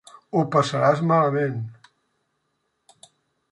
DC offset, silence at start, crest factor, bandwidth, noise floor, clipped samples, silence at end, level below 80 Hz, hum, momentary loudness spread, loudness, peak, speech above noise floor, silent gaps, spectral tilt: under 0.1%; 0.35 s; 20 dB; 11 kHz; -74 dBFS; under 0.1%; 1.8 s; -68 dBFS; none; 11 LU; -21 LUFS; -4 dBFS; 53 dB; none; -7 dB/octave